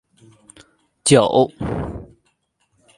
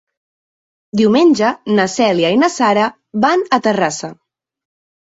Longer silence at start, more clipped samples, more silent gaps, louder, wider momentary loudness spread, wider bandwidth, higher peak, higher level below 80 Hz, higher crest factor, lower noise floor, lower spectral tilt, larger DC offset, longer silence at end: about the same, 1.05 s vs 0.95 s; neither; neither; second, -17 LUFS vs -14 LUFS; first, 17 LU vs 8 LU; first, 11.5 kHz vs 8 kHz; about the same, 0 dBFS vs -2 dBFS; first, -44 dBFS vs -58 dBFS; first, 20 dB vs 14 dB; second, -67 dBFS vs under -90 dBFS; about the same, -4.5 dB/octave vs -4.5 dB/octave; neither; about the same, 0.95 s vs 0.9 s